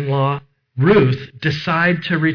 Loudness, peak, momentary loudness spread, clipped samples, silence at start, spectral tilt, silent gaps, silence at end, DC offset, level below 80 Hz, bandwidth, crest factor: -17 LUFS; -6 dBFS; 9 LU; under 0.1%; 0 s; -8 dB/octave; none; 0 s; under 0.1%; -48 dBFS; 5.4 kHz; 10 dB